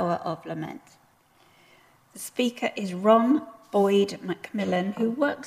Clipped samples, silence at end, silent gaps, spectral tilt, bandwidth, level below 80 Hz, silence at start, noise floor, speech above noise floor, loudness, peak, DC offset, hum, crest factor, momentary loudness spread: under 0.1%; 0 s; none; -5.5 dB/octave; 15.5 kHz; -72 dBFS; 0 s; -60 dBFS; 35 dB; -26 LUFS; -6 dBFS; under 0.1%; none; 20 dB; 15 LU